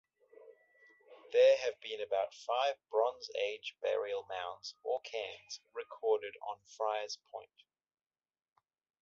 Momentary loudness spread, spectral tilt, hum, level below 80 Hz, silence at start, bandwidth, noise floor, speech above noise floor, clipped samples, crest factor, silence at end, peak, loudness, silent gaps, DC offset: 17 LU; 2 dB/octave; none; -84 dBFS; 0.4 s; 7.4 kHz; -66 dBFS; 31 dB; under 0.1%; 20 dB; 1.55 s; -18 dBFS; -36 LUFS; none; under 0.1%